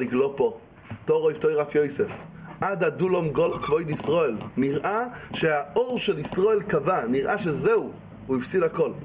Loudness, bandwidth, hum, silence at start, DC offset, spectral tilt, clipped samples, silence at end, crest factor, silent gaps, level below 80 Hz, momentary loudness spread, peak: -25 LUFS; 4 kHz; none; 0 s; under 0.1%; -10.5 dB/octave; under 0.1%; 0 s; 14 dB; none; -56 dBFS; 7 LU; -10 dBFS